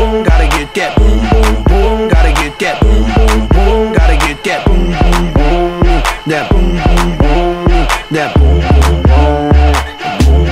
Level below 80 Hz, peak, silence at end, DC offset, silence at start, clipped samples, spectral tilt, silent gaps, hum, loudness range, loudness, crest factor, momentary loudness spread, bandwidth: -10 dBFS; 0 dBFS; 0 s; under 0.1%; 0 s; 0.3%; -6 dB/octave; none; none; 2 LU; -11 LUFS; 8 dB; 4 LU; 14 kHz